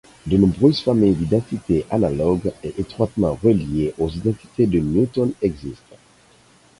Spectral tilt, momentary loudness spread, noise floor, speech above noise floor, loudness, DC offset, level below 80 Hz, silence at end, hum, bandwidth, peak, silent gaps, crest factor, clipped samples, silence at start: -8.5 dB/octave; 7 LU; -53 dBFS; 34 dB; -20 LUFS; under 0.1%; -40 dBFS; 1.05 s; none; 11.5 kHz; -2 dBFS; none; 18 dB; under 0.1%; 0.25 s